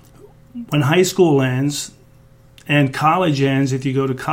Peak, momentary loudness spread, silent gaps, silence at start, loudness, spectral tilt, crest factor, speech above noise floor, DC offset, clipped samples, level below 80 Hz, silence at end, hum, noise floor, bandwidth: -2 dBFS; 11 LU; none; 0.25 s; -17 LUFS; -5.5 dB/octave; 16 dB; 31 dB; under 0.1%; under 0.1%; -52 dBFS; 0 s; none; -47 dBFS; 16.5 kHz